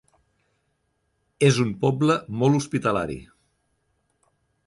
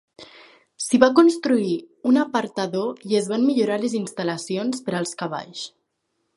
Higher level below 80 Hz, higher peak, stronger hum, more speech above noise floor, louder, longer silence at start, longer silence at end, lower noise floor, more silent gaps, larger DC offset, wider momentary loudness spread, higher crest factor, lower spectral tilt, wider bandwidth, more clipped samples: first, -56 dBFS vs -68 dBFS; second, -4 dBFS vs 0 dBFS; neither; about the same, 51 dB vs 53 dB; about the same, -22 LUFS vs -22 LUFS; first, 1.4 s vs 0.2 s; first, 1.45 s vs 0.7 s; about the same, -72 dBFS vs -74 dBFS; neither; neither; second, 8 LU vs 13 LU; about the same, 20 dB vs 22 dB; about the same, -6 dB/octave vs -5 dB/octave; about the same, 11.5 kHz vs 11.5 kHz; neither